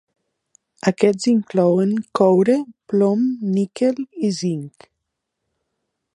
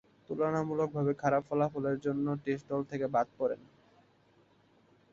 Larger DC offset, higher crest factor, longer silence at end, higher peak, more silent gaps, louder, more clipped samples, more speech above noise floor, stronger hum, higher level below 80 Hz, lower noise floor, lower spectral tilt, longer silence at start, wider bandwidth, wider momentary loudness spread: neither; about the same, 18 dB vs 18 dB; about the same, 1.45 s vs 1.55 s; first, -2 dBFS vs -16 dBFS; neither; first, -19 LUFS vs -33 LUFS; neither; first, 60 dB vs 34 dB; neither; about the same, -68 dBFS vs -70 dBFS; first, -78 dBFS vs -66 dBFS; second, -7 dB/octave vs -8.5 dB/octave; first, 0.85 s vs 0.3 s; first, 11 kHz vs 7.6 kHz; about the same, 7 LU vs 5 LU